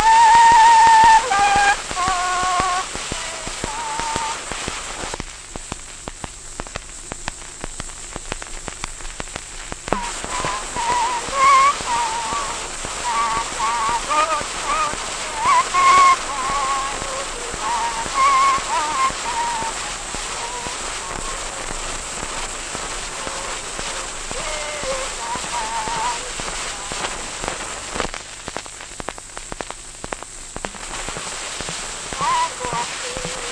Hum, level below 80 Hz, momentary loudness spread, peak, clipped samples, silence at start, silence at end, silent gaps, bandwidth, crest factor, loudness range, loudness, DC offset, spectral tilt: none; -38 dBFS; 17 LU; 0 dBFS; under 0.1%; 0 s; 0 s; none; 10.5 kHz; 20 dB; 12 LU; -20 LUFS; under 0.1%; -1 dB/octave